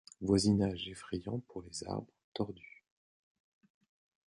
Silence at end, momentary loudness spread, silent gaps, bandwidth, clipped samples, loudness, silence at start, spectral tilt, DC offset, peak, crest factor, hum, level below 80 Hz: 1.6 s; 16 LU; 2.24-2.32 s; 11.5 kHz; under 0.1%; -36 LUFS; 0.2 s; -5.5 dB/octave; under 0.1%; -14 dBFS; 22 dB; none; -58 dBFS